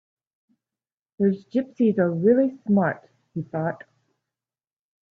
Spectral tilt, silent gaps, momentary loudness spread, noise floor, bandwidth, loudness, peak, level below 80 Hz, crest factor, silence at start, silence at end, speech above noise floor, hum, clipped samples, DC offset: -10.5 dB/octave; none; 16 LU; under -90 dBFS; 4.5 kHz; -23 LUFS; -8 dBFS; -70 dBFS; 18 dB; 1.2 s; 1.4 s; over 68 dB; none; under 0.1%; under 0.1%